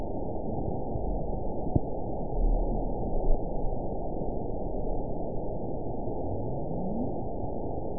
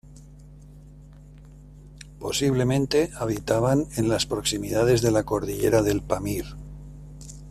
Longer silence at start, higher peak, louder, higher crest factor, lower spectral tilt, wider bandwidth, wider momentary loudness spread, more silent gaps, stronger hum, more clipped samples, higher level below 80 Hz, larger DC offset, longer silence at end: about the same, 0 s vs 0.05 s; second, -10 dBFS vs -6 dBFS; second, -34 LUFS vs -24 LUFS; about the same, 20 dB vs 18 dB; first, -16.5 dB/octave vs -5 dB/octave; second, 1 kHz vs 15.5 kHz; second, 4 LU vs 21 LU; neither; second, none vs 50 Hz at -40 dBFS; neither; first, -34 dBFS vs -44 dBFS; first, 2% vs under 0.1%; about the same, 0 s vs 0 s